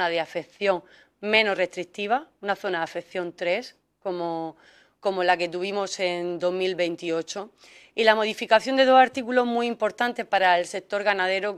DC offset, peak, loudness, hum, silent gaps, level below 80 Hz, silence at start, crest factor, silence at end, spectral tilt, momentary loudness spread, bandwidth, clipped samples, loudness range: under 0.1%; -2 dBFS; -24 LUFS; none; none; -72 dBFS; 0 s; 22 dB; 0 s; -3.5 dB/octave; 12 LU; 13 kHz; under 0.1%; 7 LU